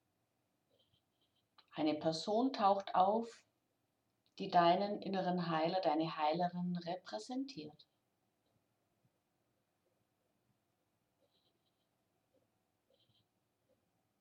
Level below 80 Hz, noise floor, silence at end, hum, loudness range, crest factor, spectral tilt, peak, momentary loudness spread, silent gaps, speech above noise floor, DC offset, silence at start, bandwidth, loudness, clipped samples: under -90 dBFS; -83 dBFS; 6.5 s; none; 12 LU; 22 dB; -6 dB/octave; -18 dBFS; 14 LU; none; 47 dB; under 0.1%; 1.75 s; 9.6 kHz; -36 LUFS; under 0.1%